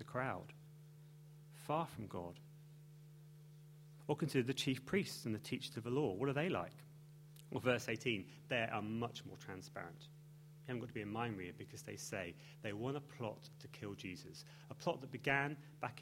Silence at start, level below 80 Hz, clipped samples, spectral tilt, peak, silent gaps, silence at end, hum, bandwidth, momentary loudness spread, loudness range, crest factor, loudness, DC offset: 0 s; -74 dBFS; under 0.1%; -5.5 dB/octave; -20 dBFS; none; 0 s; none; 16.5 kHz; 22 LU; 7 LU; 24 dB; -43 LUFS; under 0.1%